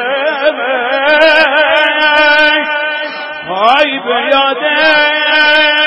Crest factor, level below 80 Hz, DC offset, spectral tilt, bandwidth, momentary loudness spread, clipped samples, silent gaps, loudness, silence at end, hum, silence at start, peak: 10 dB; -50 dBFS; under 0.1%; -3 dB/octave; 11 kHz; 8 LU; 0.2%; none; -9 LUFS; 0 s; none; 0 s; 0 dBFS